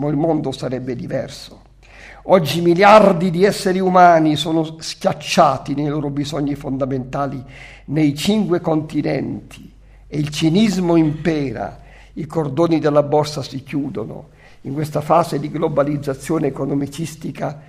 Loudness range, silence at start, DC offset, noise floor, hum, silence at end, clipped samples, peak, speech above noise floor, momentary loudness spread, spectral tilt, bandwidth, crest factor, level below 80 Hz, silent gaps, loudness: 7 LU; 0 s; under 0.1%; -42 dBFS; none; 0.1 s; under 0.1%; 0 dBFS; 25 dB; 16 LU; -6 dB/octave; 15.5 kHz; 18 dB; -46 dBFS; none; -17 LUFS